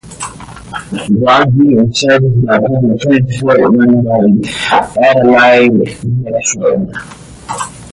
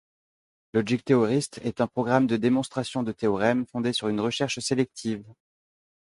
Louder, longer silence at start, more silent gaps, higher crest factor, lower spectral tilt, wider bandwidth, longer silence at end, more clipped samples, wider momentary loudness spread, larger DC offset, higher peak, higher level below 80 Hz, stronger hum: first, -10 LUFS vs -26 LUFS; second, 0.05 s vs 0.75 s; neither; second, 10 dB vs 20 dB; about the same, -5.5 dB/octave vs -5.5 dB/octave; about the same, 11.5 kHz vs 11.5 kHz; second, 0 s vs 0.75 s; neither; first, 17 LU vs 8 LU; neither; first, 0 dBFS vs -6 dBFS; first, -40 dBFS vs -62 dBFS; neither